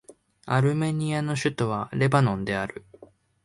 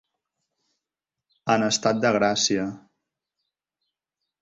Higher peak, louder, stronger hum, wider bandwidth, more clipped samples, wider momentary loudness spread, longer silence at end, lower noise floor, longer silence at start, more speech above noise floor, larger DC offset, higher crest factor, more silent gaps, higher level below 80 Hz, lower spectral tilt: about the same, -6 dBFS vs -6 dBFS; second, -25 LUFS vs -22 LUFS; neither; first, 11.5 kHz vs 8 kHz; neither; about the same, 8 LU vs 10 LU; second, 0.4 s vs 1.65 s; second, -52 dBFS vs -88 dBFS; second, 0.1 s vs 1.45 s; second, 28 dB vs 66 dB; neither; about the same, 20 dB vs 22 dB; neither; first, -56 dBFS vs -64 dBFS; first, -6.5 dB/octave vs -3.5 dB/octave